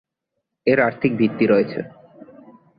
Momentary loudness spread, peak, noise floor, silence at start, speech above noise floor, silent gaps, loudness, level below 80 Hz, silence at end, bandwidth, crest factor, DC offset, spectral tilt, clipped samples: 11 LU; -4 dBFS; -79 dBFS; 0.65 s; 60 dB; none; -19 LUFS; -60 dBFS; 0.9 s; 5 kHz; 18 dB; under 0.1%; -10.5 dB/octave; under 0.1%